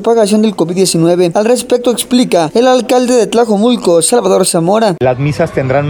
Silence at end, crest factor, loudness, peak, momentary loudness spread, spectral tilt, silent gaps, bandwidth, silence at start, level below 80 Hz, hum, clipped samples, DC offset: 0 s; 10 dB; -10 LUFS; 0 dBFS; 3 LU; -5 dB/octave; none; over 20 kHz; 0 s; -44 dBFS; none; under 0.1%; under 0.1%